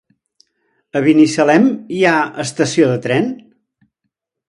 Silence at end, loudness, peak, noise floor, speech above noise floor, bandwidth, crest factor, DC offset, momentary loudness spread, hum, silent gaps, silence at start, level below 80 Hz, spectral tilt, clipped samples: 1.15 s; -14 LUFS; 0 dBFS; -75 dBFS; 62 dB; 11 kHz; 16 dB; under 0.1%; 10 LU; none; none; 0.95 s; -62 dBFS; -5.5 dB/octave; under 0.1%